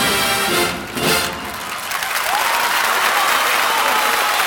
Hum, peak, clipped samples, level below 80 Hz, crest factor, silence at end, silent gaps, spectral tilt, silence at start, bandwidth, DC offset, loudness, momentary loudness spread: none; -2 dBFS; under 0.1%; -48 dBFS; 16 dB; 0 s; none; -1 dB/octave; 0 s; over 20 kHz; under 0.1%; -16 LUFS; 8 LU